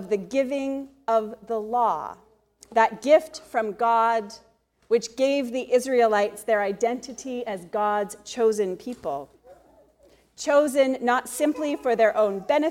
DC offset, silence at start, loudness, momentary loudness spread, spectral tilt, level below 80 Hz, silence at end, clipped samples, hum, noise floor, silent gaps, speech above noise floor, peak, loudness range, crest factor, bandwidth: under 0.1%; 0 s; -24 LUFS; 12 LU; -4 dB/octave; -66 dBFS; 0 s; under 0.1%; none; -58 dBFS; none; 35 dB; -6 dBFS; 4 LU; 18 dB; 16.5 kHz